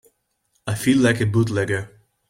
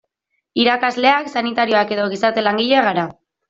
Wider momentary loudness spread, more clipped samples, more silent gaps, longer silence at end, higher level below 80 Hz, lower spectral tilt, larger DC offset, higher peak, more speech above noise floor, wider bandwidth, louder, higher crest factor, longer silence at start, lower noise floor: first, 15 LU vs 6 LU; neither; neither; about the same, 0.45 s vs 0.35 s; first, -52 dBFS vs -62 dBFS; about the same, -6 dB/octave vs -5 dB/octave; neither; second, -6 dBFS vs -2 dBFS; second, 50 dB vs 56 dB; first, 16 kHz vs 7.8 kHz; second, -20 LUFS vs -17 LUFS; about the same, 16 dB vs 16 dB; about the same, 0.65 s vs 0.55 s; about the same, -69 dBFS vs -72 dBFS